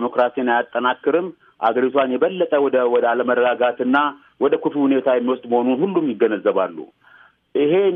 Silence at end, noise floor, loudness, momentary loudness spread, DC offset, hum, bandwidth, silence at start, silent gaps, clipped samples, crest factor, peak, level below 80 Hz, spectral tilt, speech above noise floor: 0 s; -51 dBFS; -19 LUFS; 6 LU; under 0.1%; none; 3.9 kHz; 0 s; none; under 0.1%; 14 dB; -4 dBFS; -72 dBFS; -8.5 dB/octave; 33 dB